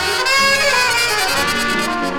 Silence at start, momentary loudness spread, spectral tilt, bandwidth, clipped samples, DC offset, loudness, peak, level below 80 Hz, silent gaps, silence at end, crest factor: 0 s; 5 LU; -1.5 dB/octave; over 20 kHz; under 0.1%; under 0.1%; -14 LUFS; -2 dBFS; -40 dBFS; none; 0 s; 14 dB